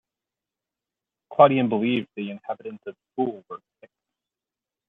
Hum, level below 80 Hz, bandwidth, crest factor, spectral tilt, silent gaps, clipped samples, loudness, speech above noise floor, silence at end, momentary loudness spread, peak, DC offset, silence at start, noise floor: none; -74 dBFS; 4 kHz; 24 dB; -9.5 dB/octave; none; under 0.1%; -23 LUFS; 66 dB; 1.35 s; 23 LU; -2 dBFS; under 0.1%; 1.3 s; -89 dBFS